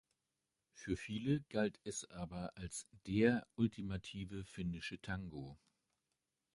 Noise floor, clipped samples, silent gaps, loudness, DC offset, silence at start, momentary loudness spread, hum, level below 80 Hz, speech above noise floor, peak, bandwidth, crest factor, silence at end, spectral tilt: -89 dBFS; under 0.1%; none; -41 LUFS; under 0.1%; 0.75 s; 13 LU; none; -62 dBFS; 49 dB; -20 dBFS; 11.5 kHz; 22 dB; 1 s; -5.5 dB/octave